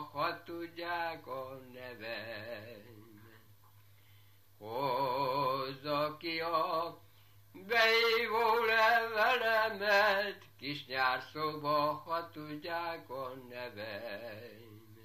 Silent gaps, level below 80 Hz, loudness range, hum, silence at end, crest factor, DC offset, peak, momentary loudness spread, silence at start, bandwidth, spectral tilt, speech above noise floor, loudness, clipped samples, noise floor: none; -80 dBFS; 14 LU; none; 0 s; 20 dB; under 0.1%; -16 dBFS; 18 LU; 0 s; 15 kHz; -4 dB/octave; 30 dB; -33 LUFS; under 0.1%; -63 dBFS